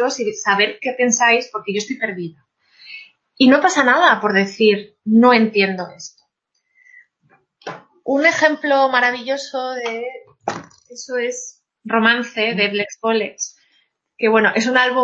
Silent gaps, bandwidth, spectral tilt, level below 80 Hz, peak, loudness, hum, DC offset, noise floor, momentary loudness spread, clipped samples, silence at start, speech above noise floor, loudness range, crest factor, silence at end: none; 8 kHz; -3 dB/octave; -70 dBFS; 0 dBFS; -17 LUFS; none; under 0.1%; -71 dBFS; 21 LU; under 0.1%; 0 s; 54 dB; 6 LU; 18 dB; 0 s